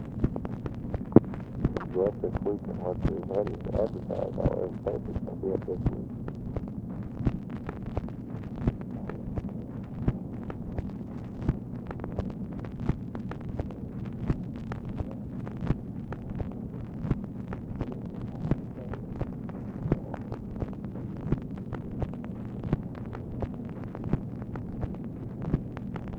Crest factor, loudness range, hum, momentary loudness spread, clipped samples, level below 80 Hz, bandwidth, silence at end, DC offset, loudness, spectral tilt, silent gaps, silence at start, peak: 32 dB; 5 LU; none; 8 LU; under 0.1%; -42 dBFS; 7 kHz; 0 s; under 0.1%; -34 LUFS; -10.5 dB/octave; none; 0 s; 0 dBFS